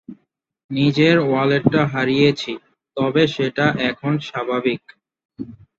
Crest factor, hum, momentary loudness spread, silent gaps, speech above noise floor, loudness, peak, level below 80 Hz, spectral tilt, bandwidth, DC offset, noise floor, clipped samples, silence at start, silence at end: 16 dB; none; 16 LU; 0.64-0.69 s, 5.25-5.29 s; 45 dB; -18 LUFS; -2 dBFS; -56 dBFS; -7 dB/octave; 7.8 kHz; under 0.1%; -63 dBFS; under 0.1%; 0.1 s; 0.25 s